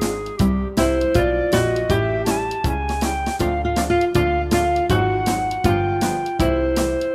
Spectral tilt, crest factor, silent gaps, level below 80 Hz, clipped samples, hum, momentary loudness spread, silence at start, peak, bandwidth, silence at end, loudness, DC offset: -6 dB/octave; 16 dB; none; -28 dBFS; under 0.1%; none; 4 LU; 0 s; -2 dBFS; 16 kHz; 0 s; -20 LUFS; under 0.1%